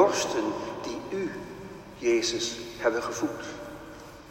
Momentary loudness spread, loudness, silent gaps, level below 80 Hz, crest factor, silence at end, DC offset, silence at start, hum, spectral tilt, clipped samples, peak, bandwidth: 17 LU; -30 LUFS; none; -58 dBFS; 22 dB; 0 s; under 0.1%; 0 s; none; -3 dB/octave; under 0.1%; -8 dBFS; 16 kHz